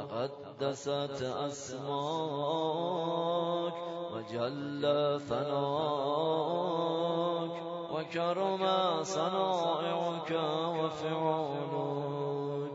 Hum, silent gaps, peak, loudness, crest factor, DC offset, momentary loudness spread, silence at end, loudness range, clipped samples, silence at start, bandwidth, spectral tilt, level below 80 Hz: none; none; -16 dBFS; -33 LUFS; 16 dB; under 0.1%; 7 LU; 0 s; 2 LU; under 0.1%; 0 s; 7.6 kHz; -4.5 dB/octave; -74 dBFS